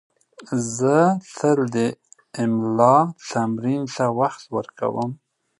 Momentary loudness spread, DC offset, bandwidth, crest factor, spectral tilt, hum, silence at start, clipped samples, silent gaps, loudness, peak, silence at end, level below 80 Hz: 13 LU; under 0.1%; 11.5 kHz; 20 dB; -6.5 dB/octave; none; 0.4 s; under 0.1%; none; -21 LUFS; -2 dBFS; 0.45 s; -66 dBFS